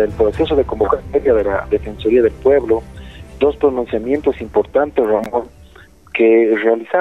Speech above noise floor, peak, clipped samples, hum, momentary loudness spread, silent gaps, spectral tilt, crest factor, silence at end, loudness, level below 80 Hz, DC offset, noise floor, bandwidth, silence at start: 28 dB; -2 dBFS; under 0.1%; none; 9 LU; none; -7.5 dB/octave; 14 dB; 0 s; -16 LUFS; -36 dBFS; 0.2%; -43 dBFS; 6.6 kHz; 0 s